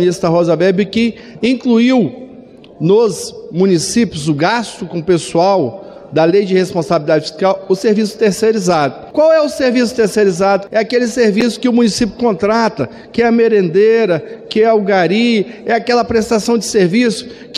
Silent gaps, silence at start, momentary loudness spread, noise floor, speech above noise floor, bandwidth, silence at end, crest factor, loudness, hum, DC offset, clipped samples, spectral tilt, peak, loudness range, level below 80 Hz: none; 0 s; 7 LU; -37 dBFS; 24 dB; 13.5 kHz; 0 s; 12 dB; -13 LUFS; none; under 0.1%; under 0.1%; -5.5 dB/octave; -2 dBFS; 2 LU; -48 dBFS